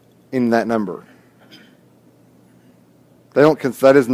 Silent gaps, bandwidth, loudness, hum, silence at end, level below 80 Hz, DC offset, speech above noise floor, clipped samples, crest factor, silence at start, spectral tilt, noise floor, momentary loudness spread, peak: none; 16 kHz; -17 LUFS; none; 0 s; -64 dBFS; under 0.1%; 37 dB; under 0.1%; 18 dB; 0.3 s; -6.5 dB/octave; -51 dBFS; 14 LU; 0 dBFS